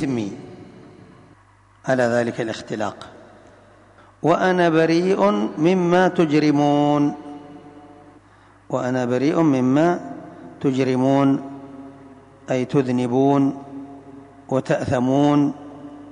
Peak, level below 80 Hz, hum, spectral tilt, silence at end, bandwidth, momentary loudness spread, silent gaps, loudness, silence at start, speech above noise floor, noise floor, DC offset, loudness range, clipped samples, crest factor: -6 dBFS; -58 dBFS; none; -7 dB/octave; 0 s; 10 kHz; 21 LU; none; -19 LUFS; 0 s; 34 dB; -53 dBFS; under 0.1%; 7 LU; under 0.1%; 14 dB